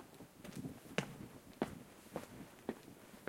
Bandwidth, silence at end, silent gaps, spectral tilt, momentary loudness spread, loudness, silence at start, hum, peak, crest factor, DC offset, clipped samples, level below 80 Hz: 16.5 kHz; 0 s; none; -5 dB/octave; 12 LU; -48 LUFS; 0 s; none; -20 dBFS; 28 dB; under 0.1%; under 0.1%; -72 dBFS